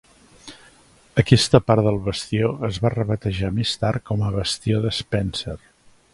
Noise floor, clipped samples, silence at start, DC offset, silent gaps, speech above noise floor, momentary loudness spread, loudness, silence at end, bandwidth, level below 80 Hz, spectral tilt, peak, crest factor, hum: -53 dBFS; under 0.1%; 0.45 s; under 0.1%; none; 32 dB; 10 LU; -21 LUFS; 0.55 s; 11.5 kHz; -42 dBFS; -5.5 dB/octave; 0 dBFS; 22 dB; none